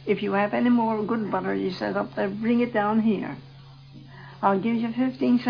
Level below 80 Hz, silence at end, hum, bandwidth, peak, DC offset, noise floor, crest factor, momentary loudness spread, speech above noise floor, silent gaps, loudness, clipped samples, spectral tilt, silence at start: -62 dBFS; 0 s; none; 5.4 kHz; -6 dBFS; under 0.1%; -46 dBFS; 18 dB; 7 LU; 22 dB; none; -25 LUFS; under 0.1%; -8.5 dB/octave; 0 s